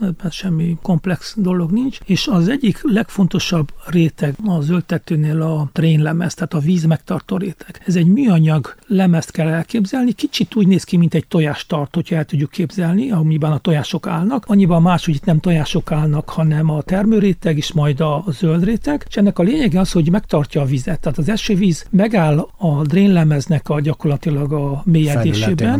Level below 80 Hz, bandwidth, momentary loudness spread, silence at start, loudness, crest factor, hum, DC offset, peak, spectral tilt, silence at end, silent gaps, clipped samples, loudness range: -36 dBFS; 14 kHz; 6 LU; 0 s; -16 LUFS; 12 dB; none; under 0.1%; -4 dBFS; -7 dB/octave; 0 s; none; under 0.1%; 2 LU